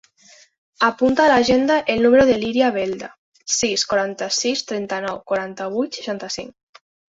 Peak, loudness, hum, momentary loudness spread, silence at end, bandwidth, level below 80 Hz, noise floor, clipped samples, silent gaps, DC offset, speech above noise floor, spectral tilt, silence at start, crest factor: -2 dBFS; -19 LUFS; none; 13 LU; 0.6 s; 8 kHz; -52 dBFS; -51 dBFS; under 0.1%; 3.18-3.32 s; under 0.1%; 32 dB; -3 dB/octave; 0.8 s; 18 dB